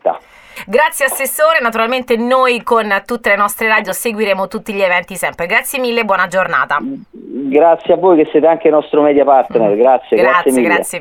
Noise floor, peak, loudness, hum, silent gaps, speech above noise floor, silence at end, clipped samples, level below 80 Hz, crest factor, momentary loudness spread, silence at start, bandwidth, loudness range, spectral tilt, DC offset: -34 dBFS; 0 dBFS; -12 LUFS; none; none; 22 dB; 0 s; under 0.1%; -54 dBFS; 12 dB; 8 LU; 0.05 s; 19.5 kHz; 4 LU; -3.5 dB/octave; under 0.1%